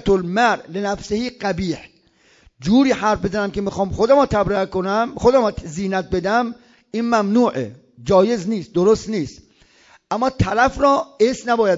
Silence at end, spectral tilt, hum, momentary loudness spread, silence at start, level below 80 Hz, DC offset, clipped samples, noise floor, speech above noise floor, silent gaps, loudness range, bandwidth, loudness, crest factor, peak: 0 s; -6 dB/octave; none; 11 LU; 0.05 s; -42 dBFS; under 0.1%; under 0.1%; -55 dBFS; 38 dB; none; 2 LU; 7.8 kHz; -19 LUFS; 16 dB; -2 dBFS